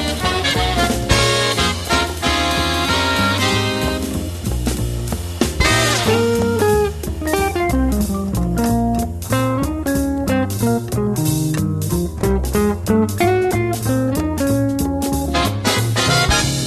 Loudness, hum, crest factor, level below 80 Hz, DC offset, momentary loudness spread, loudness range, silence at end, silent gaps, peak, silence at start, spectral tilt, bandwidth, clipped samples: -18 LUFS; none; 16 dB; -28 dBFS; under 0.1%; 6 LU; 3 LU; 0 s; none; 0 dBFS; 0 s; -4.5 dB/octave; 13.5 kHz; under 0.1%